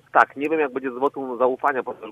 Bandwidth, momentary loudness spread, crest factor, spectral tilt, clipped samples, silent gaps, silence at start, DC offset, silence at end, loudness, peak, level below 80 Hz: 13 kHz; 6 LU; 22 dB; -6 dB/octave; under 0.1%; none; 0.15 s; under 0.1%; 0 s; -23 LUFS; 0 dBFS; -70 dBFS